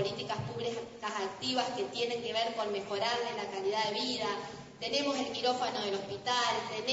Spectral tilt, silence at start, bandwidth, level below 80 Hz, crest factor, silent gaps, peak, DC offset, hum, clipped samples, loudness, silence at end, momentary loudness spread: -3 dB/octave; 0 s; 8 kHz; -70 dBFS; 18 dB; none; -16 dBFS; under 0.1%; none; under 0.1%; -34 LUFS; 0 s; 6 LU